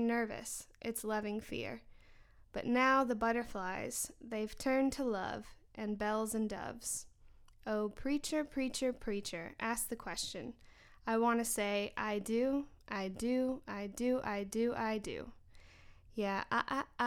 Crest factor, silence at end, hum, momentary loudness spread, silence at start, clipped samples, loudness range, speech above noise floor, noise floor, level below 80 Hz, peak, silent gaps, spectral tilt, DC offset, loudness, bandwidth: 18 dB; 0 s; none; 11 LU; 0 s; under 0.1%; 4 LU; 24 dB; -60 dBFS; -60 dBFS; -18 dBFS; none; -3.5 dB/octave; under 0.1%; -37 LUFS; 19 kHz